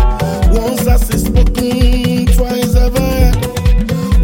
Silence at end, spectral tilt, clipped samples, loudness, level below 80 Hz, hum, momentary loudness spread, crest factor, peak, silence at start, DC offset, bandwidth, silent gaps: 0 s; -6 dB/octave; under 0.1%; -13 LUFS; -12 dBFS; none; 2 LU; 10 dB; 0 dBFS; 0 s; under 0.1%; 17 kHz; none